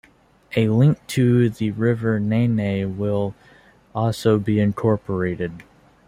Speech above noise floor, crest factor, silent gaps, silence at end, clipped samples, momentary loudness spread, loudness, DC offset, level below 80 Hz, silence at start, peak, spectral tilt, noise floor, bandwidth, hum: 33 dB; 16 dB; none; 0.45 s; under 0.1%; 8 LU; -21 LUFS; under 0.1%; -54 dBFS; 0.5 s; -4 dBFS; -8 dB/octave; -53 dBFS; 15.5 kHz; none